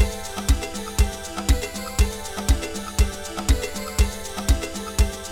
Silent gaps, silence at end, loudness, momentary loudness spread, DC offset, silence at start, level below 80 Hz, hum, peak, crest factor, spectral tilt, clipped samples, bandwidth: none; 0 s; -25 LUFS; 4 LU; under 0.1%; 0 s; -24 dBFS; none; -4 dBFS; 18 dB; -4.5 dB/octave; under 0.1%; 17 kHz